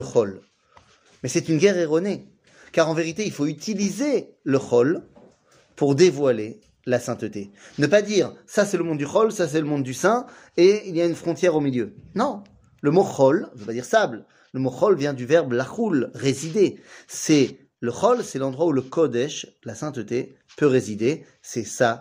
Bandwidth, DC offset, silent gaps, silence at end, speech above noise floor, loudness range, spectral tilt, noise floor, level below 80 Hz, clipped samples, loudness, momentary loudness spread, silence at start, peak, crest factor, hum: 16 kHz; under 0.1%; none; 0 s; 36 dB; 3 LU; -5.5 dB/octave; -57 dBFS; -66 dBFS; under 0.1%; -22 LUFS; 13 LU; 0 s; -4 dBFS; 18 dB; none